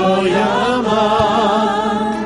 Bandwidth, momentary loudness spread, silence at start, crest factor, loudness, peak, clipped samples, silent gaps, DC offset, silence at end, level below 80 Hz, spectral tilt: 11.5 kHz; 3 LU; 0 s; 12 dB; -15 LUFS; -2 dBFS; under 0.1%; none; under 0.1%; 0 s; -42 dBFS; -5.5 dB/octave